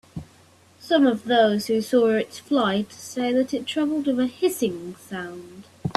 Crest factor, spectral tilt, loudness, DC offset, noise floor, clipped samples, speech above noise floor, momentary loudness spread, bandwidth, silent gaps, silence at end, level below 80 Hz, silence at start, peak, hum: 20 dB; -5 dB/octave; -23 LUFS; under 0.1%; -54 dBFS; under 0.1%; 32 dB; 15 LU; 14 kHz; none; 0.05 s; -60 dBFS; 0.15 s; -2 dBFS; none